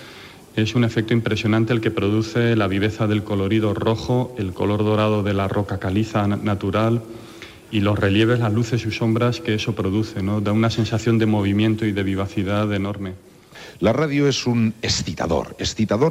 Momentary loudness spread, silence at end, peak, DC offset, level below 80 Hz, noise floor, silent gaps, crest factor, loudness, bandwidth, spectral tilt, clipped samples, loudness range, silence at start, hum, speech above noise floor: 7 LU; 0 s; -6 dBFS; under 0.1%; -48 dBFS; -42 dBFS; none; 14 dB; -21 LUFS; 14.5 kHz; -6.5 dB/octave; under 0.1%; 2 LU; 0 s; none; 22 dB